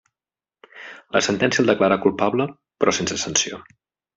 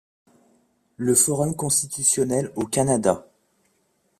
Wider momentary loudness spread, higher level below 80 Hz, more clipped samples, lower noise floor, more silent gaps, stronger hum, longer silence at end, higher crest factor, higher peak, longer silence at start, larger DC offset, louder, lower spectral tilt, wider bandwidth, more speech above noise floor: first, 21 LU vs 7 LU; about the same, -60 dBFS vs -58 dBFS; neither; first, under -90 dBFS vs -68 dBFS; neither; neither; second, 0.55 s vs 1 s; about the same, 20 dB vs 22 dB; about the same, -2 dBFS vs -4 dBFS; second, 0.75 s vs 1 s; neither; about the same, -20 LUFS vs -21 LUFS; about the same, -3.5 dB/octave vs -4 dB/octave; second, 8.2 kHz vs 15.5 kHz; first, over 70 dB vs 46 dB